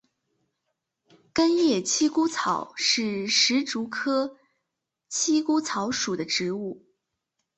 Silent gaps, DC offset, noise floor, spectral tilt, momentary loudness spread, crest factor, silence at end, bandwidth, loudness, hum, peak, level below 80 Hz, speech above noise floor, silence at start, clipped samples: none; under 0.1%; -83 dBFS; -2.5 dB/octave; 10 LU; 18 dB; 0.8 s; 8.4 kHz; -24 LUFS; none; -8 dBFS; -68 dBFS; 58 dB; 1.35 s; under 0.1%